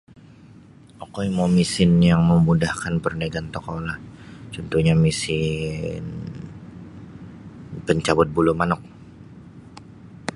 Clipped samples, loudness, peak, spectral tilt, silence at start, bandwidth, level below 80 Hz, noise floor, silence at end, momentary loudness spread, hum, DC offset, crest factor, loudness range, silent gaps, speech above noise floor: under 0.1%; -21 LUFS; -2 dBFS; -6.5 dB/octave; 1 s; 11.5 kHz; -42 dBFS; -47 dBFS; 0 s; 24 LU; none; under 0.1%; 22 dB; 5 LU; none; 27 dB